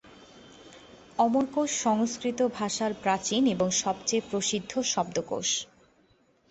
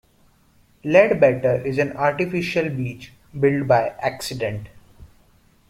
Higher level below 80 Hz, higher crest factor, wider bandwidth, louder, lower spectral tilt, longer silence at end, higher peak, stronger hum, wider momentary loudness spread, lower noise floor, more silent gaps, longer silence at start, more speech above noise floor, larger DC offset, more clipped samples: second, -64 dBFS vs -52 dBFS; about the same, 18 dB vs 20 dB; second, 8.4 kHz vs 15.5 kHz; second, -27 LUFS vs -20 LUFS; second, -3 dB/octave vs -6.5 dB/octave; first, 0.85 s vs 0.65 s; second, -12 dBFS vs -2 dBFS; neither; second, 4 LU vs 14 LU; first, -65 dBFS vs -57 dBFS; neither; second, 0.05 s vs 0.85 s; about the same, 37 dB vs 37 dB; neither; neither